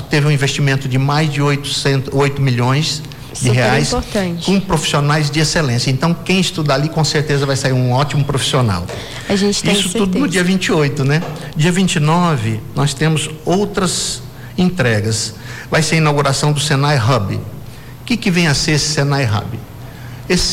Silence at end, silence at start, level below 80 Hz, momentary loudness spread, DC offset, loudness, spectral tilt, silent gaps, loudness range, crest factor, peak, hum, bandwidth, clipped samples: 0 s; 0 s; -36 dBFS; 9 LU; under 0.1%; -15 LUFS; -5 dB/octave; none; 2 LU; 10 dB; -6 dBFS; none; 16 kHz; under 0.1%